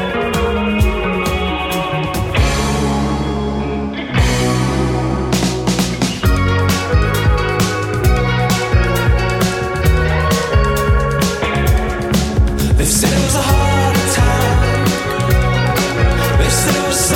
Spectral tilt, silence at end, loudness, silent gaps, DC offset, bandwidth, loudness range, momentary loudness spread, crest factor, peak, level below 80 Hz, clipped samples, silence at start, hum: -5 dB/octave; 0 s; -15 LUFS; none; under 0.1%; 17.5 kHz; 3 LU; 4 LU; 14 dB; 0 dBFS; -20 dBFS; under 0.1%; 0 s; none